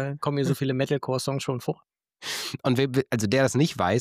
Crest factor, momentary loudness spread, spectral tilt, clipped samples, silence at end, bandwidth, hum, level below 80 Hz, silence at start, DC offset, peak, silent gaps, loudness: 16 dB; 9 LU; -5.5 dB/octave; under 0.1%; 0 s; 16 kHz; none; -62 dBFS; 0 s; under 0.1%; -10 dBFS; none; -26 LUFS